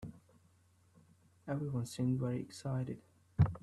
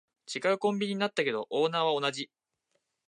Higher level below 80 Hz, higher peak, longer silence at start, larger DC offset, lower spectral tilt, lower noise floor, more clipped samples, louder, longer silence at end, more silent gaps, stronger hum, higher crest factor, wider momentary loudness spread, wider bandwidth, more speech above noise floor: first, -58 dBFS vs -84 dBFS; about the same, -16 dBFS vs -14 dBFS; second, 0 s vs 0.3 s; neither; first, -7.5 dB/octave vs -4.5 dB/octave; second, -69 dBFS vs -79 dBFS; neither; second, -38 LUFS vs -30 LUFS; second, 0.05 s vs 0.85 s; neither; neither; first, 22 dB vs 16 dB; first, 16 LU vs 10 LU; first, 12.5 kHz vs 11 kHz; second, 31 dB vs 50 dB